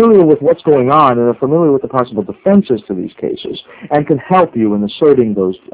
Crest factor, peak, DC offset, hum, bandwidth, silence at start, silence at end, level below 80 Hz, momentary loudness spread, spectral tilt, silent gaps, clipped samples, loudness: 12 dB; 0 dBFS; under 0.1%; none; 4 kHz; 0 s; 0.15 s; -50 dBFS; 12 LU; -11.5 dB/octave; none; 0.5%; -12 LUFS